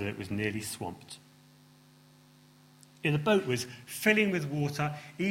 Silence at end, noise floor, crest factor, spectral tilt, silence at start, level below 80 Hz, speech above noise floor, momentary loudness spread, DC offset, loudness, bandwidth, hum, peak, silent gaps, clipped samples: 0 s; -59 dBFS; 24 dB; -5 dB/octave; 0 s; -66 dBFS; 28 dB; 14 LU; under 0.1%; -31 LUFS; 16.5 kHz; none; -10 dBFS; none; under 0.1%